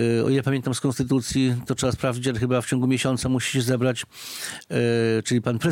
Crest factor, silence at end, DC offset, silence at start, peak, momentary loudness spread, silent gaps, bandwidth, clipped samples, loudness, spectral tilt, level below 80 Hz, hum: 14 dB; 0 s; under 0.1%; 0 s; -10 dBFS; 6 LU; none; 17 kHz; under 0.1%; -23 LUFS; -5.5 dB/octave; -50 dBFS; none